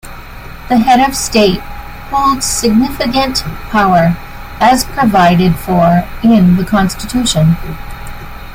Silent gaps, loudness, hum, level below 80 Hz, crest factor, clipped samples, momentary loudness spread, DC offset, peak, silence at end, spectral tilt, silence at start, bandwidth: none; -11 LUFS; none; -28 dBFS; 12 dB; under 0.1%; 20 LU; under 0.1%; 0 dBFS; 0 s; -5 dB/octave; 0.05 s; 16.5 kHz